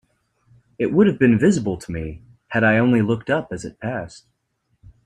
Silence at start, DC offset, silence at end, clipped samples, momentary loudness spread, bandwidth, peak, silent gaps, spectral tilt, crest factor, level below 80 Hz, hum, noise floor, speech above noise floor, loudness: 0.8 s; under 0.1%; 0.9 s; under 0.1%; 15 LU; 10.5 kHz; -4 dBFS; none; -7 dB/octave; 18 dB; -50 dBFS; none; -70 dBFS; 51 dB; -20 LUFS